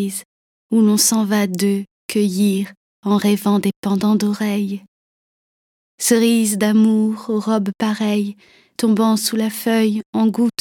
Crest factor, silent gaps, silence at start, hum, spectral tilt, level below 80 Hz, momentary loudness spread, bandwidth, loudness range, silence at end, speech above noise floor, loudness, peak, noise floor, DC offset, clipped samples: 16 dB; 0.25-0.69 s, 1.91-2.09 s, 2.77-3.03 s, 3.76-3.83 s, 4.88-5.98 s, 10.06-10.13 s; 0 s; none; -4.5 dB/octave; -68 dBFS; 9 LU; 18 kHz; 2 LU; 0.1 s; over 73 dB; -18 LUFS; -2 dBFS; under -90 dBFS; under 0.1%; under 0.1%